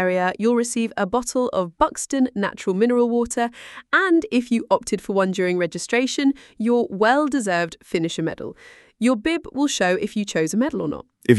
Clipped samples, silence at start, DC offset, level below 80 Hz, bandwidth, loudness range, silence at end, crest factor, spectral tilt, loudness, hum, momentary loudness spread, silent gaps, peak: under 0.1%; 0 s; under 0.1%; -54 dBFS; 12 kHz; 2 LU; 0 s; 20 dB; -4.5 dB/octave; -21 LUFS; none; 7 LU; none; 0 dBFS